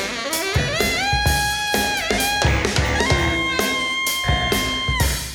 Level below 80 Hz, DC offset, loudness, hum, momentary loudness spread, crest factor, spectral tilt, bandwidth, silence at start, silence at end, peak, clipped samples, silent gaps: -28 dBFS; under 0.1%; -19 LUFS; none; 2 LU; 18 dB; -3 dB/octave; over 20 kHz; 0 s; 0 s; -2 dBFS; under 0.1%; none